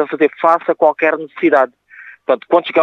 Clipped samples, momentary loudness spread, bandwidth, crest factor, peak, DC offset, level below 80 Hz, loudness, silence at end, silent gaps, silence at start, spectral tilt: under 0.1%; 6 LU; 6.6 kHz; 14 dB; 0 dBFS; under 0.1%; -74 dBFS; -15 LUFS; 0 s; none; 0 s; -6.5 dB/octave